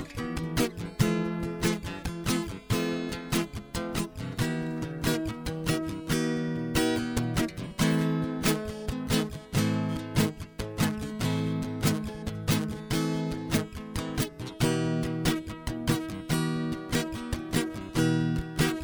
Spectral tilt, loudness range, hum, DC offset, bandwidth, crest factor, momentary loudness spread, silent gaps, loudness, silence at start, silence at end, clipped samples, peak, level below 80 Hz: -5 dB/octave; 3 LU; none; under 0.1%; over 20 kHz; 18 dB; 7 LU; none; -30 LUFS; 0 s; 0 s; under 0.1%; -10 dBFS; -44 dBFS